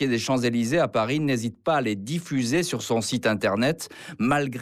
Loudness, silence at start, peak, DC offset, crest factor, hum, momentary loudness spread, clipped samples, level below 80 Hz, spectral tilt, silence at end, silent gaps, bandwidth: -24 LUFS; 0 s; -12 dBFS; under 0.1%; 12 dB; none; 5 LU; under 0.1%; -58 dBFS; -5 dB/octave; 0 s; none; 15.5 kHz